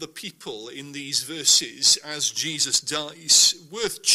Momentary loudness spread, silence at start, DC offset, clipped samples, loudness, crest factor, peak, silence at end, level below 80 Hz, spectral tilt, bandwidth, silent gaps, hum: 20 LU; 0 s; under 0.1%; under 0.1%; -19 LUFS; 22 dB; -2 dBFS; 0 s; -66 dBFS; 0.5 dB/octave; 16 kHz; none; none